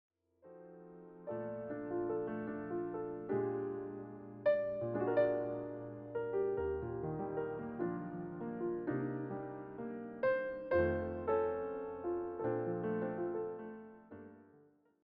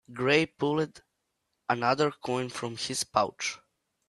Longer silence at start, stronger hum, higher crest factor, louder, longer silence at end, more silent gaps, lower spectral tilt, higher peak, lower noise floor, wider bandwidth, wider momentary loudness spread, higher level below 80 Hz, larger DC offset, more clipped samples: first, 0.45 s vs 0.1 s; neither; about the same, 18 dB vs 22 dB; second, -39 LUFS vs -29 LUFS; about the same, 0.45 s vs 0.55 s; neither; first, -7.5 dB/octave vs -4 dB/octave; second, -20 dBFS vs -8 dBFS; second, -67 dBFS vs -80 dBFS; second, 5.2 kHz vs 12.5 kHz; first, 16 LU vs 10 LU; about the same, -64 dBFS vs -68 dBFS; neither; neither